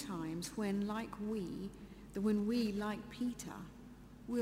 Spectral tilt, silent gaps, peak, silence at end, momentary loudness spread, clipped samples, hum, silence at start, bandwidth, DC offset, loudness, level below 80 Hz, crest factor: -6 dB/octave; none; -26 dBFS; 0 s; 18 LU; under 0.1%; none; 0 s; 16 kHz; under 0.1%; -40 LUFS; -62 dBFS; 14 dB